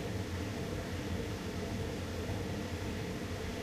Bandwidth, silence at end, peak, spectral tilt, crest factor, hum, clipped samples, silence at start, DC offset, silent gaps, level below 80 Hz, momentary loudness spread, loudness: 15.5 kHz; 0 s; -26 dBFS; -5.5 dB/octave; 12 dB; none; under 0.1%; 0 s; under 0.1%; none; -48 dBFS; 1 LU; -39 LUFS